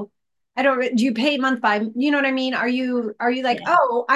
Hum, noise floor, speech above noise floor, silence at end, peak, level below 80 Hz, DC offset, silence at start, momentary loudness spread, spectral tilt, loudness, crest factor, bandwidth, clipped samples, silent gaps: none; -64 dBFS; 45 dB; 0 s; -4 dBFS; -74 dBFS; under 0.1%; 0 s; 5 LU; -4.5 dB/octave; -20 LUFS; 16 dB; 11.5 kHz; under 0.1%; none